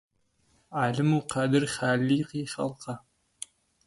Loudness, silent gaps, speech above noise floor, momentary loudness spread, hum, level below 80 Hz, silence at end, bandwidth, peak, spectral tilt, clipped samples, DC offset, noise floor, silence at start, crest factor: -28 LUFS; none; 42 dB; 18 LU; none; -64 dBFS; 0.9 s; 11.5 kHz; -10 dBFS; -5.5 dB/octave; under 0.1%; under 0.1%; -69 dBFS; 0.7 s; 18 dB